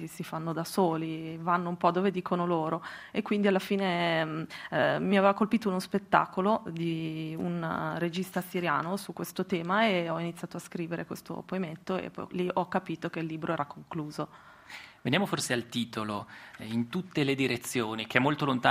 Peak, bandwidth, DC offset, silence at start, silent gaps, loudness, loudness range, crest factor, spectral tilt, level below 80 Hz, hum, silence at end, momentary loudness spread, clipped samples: -6 dBFS; 15.5 kHz; under 0.1%; 0 s; none; -30 LUFS; 6 LU; 24 dB; -5.5 dB/octave; -70 dBFS; none; 0 s; 11 LU; under 0.1%